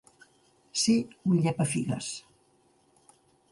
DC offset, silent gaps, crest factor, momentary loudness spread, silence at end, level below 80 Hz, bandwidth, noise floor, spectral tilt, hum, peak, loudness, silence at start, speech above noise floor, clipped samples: under 0.1%; none; 18 dB; 10 LU; 1.3 s; -66 dBFS; 11.5 kHz; -66 dBFS; -5 dB/octave; none; -14 dBFS; -28 LUFS; 0.75 s; 39 dB; under 0.1%